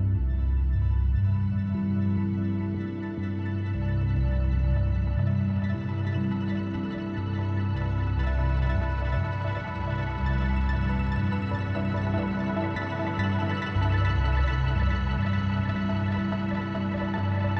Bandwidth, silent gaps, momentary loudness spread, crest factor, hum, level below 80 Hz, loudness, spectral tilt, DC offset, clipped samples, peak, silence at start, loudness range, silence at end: 6.2 kHz; none; 4 LU; 12 dB; none; -30 dBFS; -27 LUFS; -9 dB/octave; under 0.1%; under 0.1%; -14 dBFS; 0 s; 2 LU; 0 s